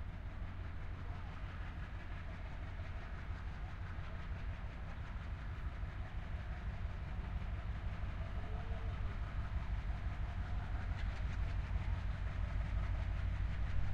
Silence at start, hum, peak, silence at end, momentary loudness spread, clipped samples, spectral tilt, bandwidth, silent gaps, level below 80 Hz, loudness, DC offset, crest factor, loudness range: 0 s; none; -24 dBFS; 0 s; 7 LU; under 0.1%; -7.5 dB/octave; 7 kHz; none; -42 dBFS; -45 LUFS; under 0.1%; 16 dB; 6 LU